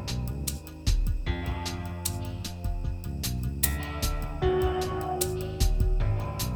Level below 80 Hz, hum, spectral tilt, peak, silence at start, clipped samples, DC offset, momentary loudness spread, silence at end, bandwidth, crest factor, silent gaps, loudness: -32 dBFS; none; -5 dB/octave; -6 dBFS; 0 s; under 0.1%; under 0.1%; 7 LU; 0 s; 19.5 kHz; 22 dB; none; -30 LUFS